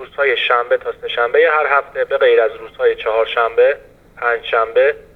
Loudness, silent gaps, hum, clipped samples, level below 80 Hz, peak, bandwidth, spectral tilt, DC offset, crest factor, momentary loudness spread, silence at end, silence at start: -15 LUFS; none; none; under 0.1%; -52 dBFS; 0 dBFS; 4.4 kHz; -4 dB/octave; under 0.1%; 16 dB; 7 LU; 0.2 s; 0 s